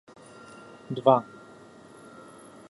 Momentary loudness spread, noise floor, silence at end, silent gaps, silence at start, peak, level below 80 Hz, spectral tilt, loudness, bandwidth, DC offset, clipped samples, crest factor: 26 LU; -50 dBFS; 1.45 s; none; 0.9 s; -6 dBFS; -74 dBFS; -7 dB/octave; -24 LUFS; 11.5 kHz; under 0.1%; under 0.1%; 26 dB